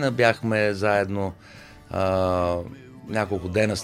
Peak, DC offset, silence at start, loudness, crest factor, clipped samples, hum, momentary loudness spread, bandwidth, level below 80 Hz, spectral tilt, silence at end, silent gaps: -4 dBFS; under 0.1%; 0 s; -24 LUFS; 20 dB; under 0.1%; none; 12 LU; 15 kHz; -50 dBFS; -6 dB/octave; 0 s; none